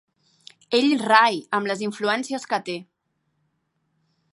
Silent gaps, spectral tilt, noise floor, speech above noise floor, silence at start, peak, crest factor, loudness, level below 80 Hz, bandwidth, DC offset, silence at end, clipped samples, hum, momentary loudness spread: none; -3.5 dB/octave; -73 dBFS; 52 dB; 0.7 s; -2 dBFS; 22 dB; -21 LUFS; -78 dBFS; 11.5 kHz; under 0.1%; 1.5 s; under 0.1%; none; 10 LU